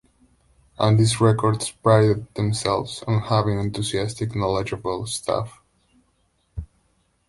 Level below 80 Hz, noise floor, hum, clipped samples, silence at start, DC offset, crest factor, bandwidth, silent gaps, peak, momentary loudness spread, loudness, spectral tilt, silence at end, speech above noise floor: -46 dBFS; -66 dBFS; none; under 0.1%; 0.8 s; under 0.1%; 20 dB; 11.5 kHz; none; -2 dBFS; 10 LU; -22 LUFS; -6 dB/octave; 0.65 s; 45 dB